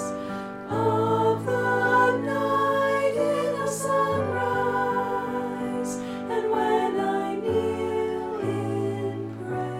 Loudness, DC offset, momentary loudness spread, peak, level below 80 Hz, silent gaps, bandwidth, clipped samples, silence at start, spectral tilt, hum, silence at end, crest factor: -25 LUFS; under 0.1%; 8 LU; -10 dBFS; -60 dBFS; none; 16 kHz; under 0.1%; 0 s; -5.5 dB/octave; none; 0 s; 16 dB